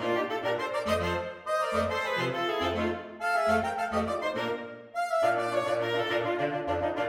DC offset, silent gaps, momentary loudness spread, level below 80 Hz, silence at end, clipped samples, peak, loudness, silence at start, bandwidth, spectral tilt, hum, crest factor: under 0.1%; none; 6 LU; -56 dBFS; 0 s; under 0.1%; -14 dBFS; -29 LUFS; 0 s; 17 kHz; -5 dB/octave; none; 14 dB